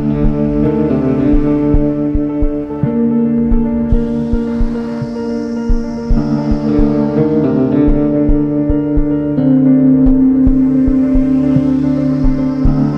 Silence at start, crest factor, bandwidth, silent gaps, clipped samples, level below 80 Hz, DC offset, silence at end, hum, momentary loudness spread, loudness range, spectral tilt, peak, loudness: 0 s; 12 dB; 6.2 kHz; none; under 0.1%; -20 dBFS; under 0.1%; 0 s; none; 8 LU; 5 LU; -10.5 dB/octave; 0 dBFS; -13 LUFS